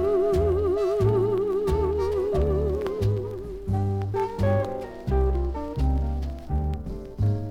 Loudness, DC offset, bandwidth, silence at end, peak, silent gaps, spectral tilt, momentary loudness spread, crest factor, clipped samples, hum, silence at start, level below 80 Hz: -26 LUFS; under 0.1%; 12 kHz; 0 s; -10 dBFS; none; -9 dB/octave; 8 LU; 14 dB; under 0.1%; none; 0 s; -32 dBFS